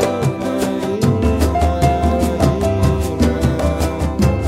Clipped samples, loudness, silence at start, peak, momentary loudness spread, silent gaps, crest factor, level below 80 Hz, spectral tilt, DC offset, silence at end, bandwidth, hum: under 0.1%; -17 LUFS; 0 s; -2 dBFS; 4 LU; none; 14 dB; -22 dBFS; -7 dB/octave; under 0.1%; 0 s; 15.5 kHz; none